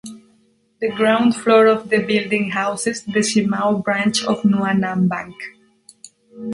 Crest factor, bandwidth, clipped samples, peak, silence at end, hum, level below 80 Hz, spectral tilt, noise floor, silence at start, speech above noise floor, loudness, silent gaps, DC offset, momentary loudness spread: 18 dB; 11.5 kHz; under 0.1%; -2 dBFS; 0 s; none; -60 dBFS; -5 dB/octave; -59 dBFS; 0.05 s; 41 dB; -18 LUFS; none; under 0.1%; 13 LU